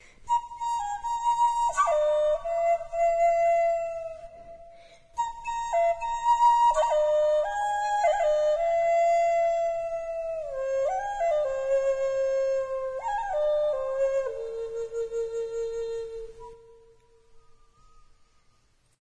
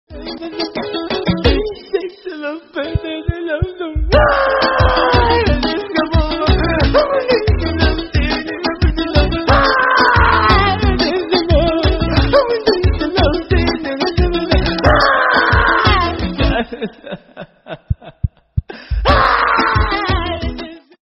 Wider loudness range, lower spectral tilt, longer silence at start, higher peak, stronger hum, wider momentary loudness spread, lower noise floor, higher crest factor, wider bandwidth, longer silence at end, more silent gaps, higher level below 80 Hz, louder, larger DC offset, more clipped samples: first, 11 LU vs 6 LU; second, -1.5 dB/octave vs -7.5 dB/octave; about the same, 0.2 s vs 0.1 s; second, -12 dBFS vs 0 dBFS; neither; second, 11 LU vs 14 LU; first, -64 dBFS vs -36 dBFS; about the same, 14 dB vs 14 dB; first, 10.5 kHz vs 6 kHz; first, 1.65 s vs 0.3 s; neither; second, -52 dBFS vs -22 dBFS; second, -26 LUFS vs -15 LUFS; neither; neither